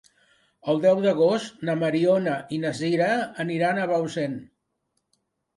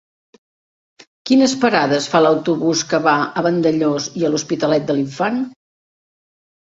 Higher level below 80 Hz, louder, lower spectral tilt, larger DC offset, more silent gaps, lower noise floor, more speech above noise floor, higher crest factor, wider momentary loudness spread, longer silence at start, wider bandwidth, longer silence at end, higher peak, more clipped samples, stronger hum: second, -70 dBFS vs -62 dBFS; second, -24 LUFS vs -17 LUFS; first, -6.5 dB/octave vs -4.5 dB/octave; neither; neither; second, -76 dBFS vs under -90 dBFS; second, 53 dB vs over 74 dB; about the same, 16 dB vs 16 dB; first, 9 LU vs 6 LU; second, 0.65 s vs 1.25 s; first, 11.5 kHz vs 8 kHz; about the same, 1.15 s vs 1.15 s; second, -8 dBFS vs -2 dBFS; neither; neither